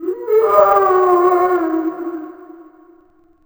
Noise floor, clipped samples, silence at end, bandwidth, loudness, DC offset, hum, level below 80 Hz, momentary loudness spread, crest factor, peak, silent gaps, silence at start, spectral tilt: -51 dBFS; under 0.1%; 0.85 s; over 20 kHz; -14 LUFS; under 0.1%; none; -58 dBFS; 16 LU; 16 dB; 0 dBFS; none; 0 s; -6.5 dB/octave